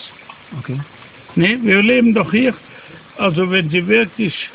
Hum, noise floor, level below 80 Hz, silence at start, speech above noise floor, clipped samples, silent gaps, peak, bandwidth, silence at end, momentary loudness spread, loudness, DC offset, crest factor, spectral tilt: none; -39 dBFS; -52 dBFS; 0 s; 24 dB; under 0.1%; none; 0 dBFS; 4 kHz; 0.05 s; 21 LU; -15 LUFS; under 0.1%; 16 dB; -10 dB/octave